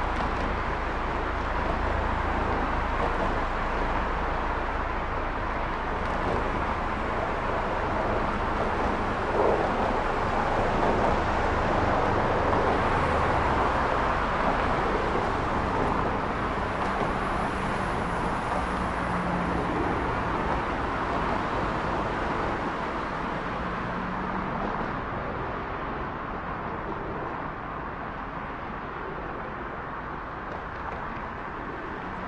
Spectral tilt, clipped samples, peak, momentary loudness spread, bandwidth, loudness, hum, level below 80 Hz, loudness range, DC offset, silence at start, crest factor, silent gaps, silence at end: -6.5 dB/octave; under 0.1%; -10 dBFS; 10 LU; 11 kHz; -28 LUFS; none; -36 dBFS; 9 LU; under 0.1%; 0 s; 18 dB; none; 0 s